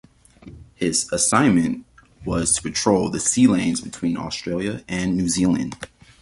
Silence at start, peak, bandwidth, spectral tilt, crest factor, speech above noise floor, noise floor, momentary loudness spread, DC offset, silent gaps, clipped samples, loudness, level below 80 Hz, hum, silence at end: 0.45 s; -2 dBFS; 11.5 kHz; -4 dB/octave; 18 dB; 24 dB; -45 dBFS; 10 LU; under 0.1%; none; under 0.1%; -20 LUFS; -46 dBFS; none; 0.35 s